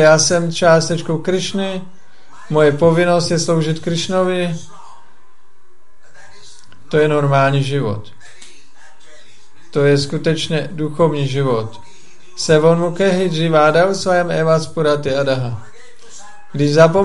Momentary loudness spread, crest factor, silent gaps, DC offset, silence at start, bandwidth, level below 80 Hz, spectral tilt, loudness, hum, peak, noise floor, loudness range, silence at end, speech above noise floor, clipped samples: 11 LU; 16 dB; none; 4%; 0 s; 11.5 kHz; -54 dBFS; -5 dB/octave; -15 LUFS; none; 0 dBFS; -56 dBFS; 6 LU; 0 s; 42 dB; under 0.1%